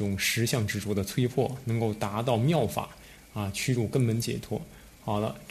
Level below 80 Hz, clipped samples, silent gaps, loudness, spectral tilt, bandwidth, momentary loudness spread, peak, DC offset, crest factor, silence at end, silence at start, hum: -54 dBFS; under 0.1%; none; -29 LUFS; -5.5 dB/octave; 14 kHz; 11 LU; -12 dBFS; under 0.1%; 16 dB; 0 s; 0 s; none